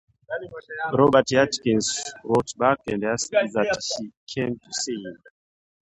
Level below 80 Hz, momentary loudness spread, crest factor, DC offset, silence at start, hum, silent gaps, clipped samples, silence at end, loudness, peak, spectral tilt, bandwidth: -58 dBFS; 15 LU; 20 dB; under 0.1%; 0.3 s; none; 4.17-4.27 s; under 0.1%; 0.75 s; -23 LUFS; -4 dBFS; -4 dB/octave; 11 kHz